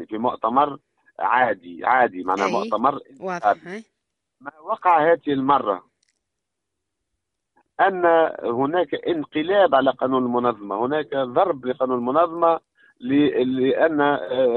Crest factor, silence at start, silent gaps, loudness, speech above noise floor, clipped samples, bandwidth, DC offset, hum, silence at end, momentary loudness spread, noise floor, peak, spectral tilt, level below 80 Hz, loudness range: 18 dB; 0 s; none; -21 LUFS; 61 dB; under 0.1%; 7.2 kHz; under 0.1%; none; 0 s; 10 LU; -82 dBFS; -4 dBFS; -6.5 dB/octave; -66 dBFS; 3 LU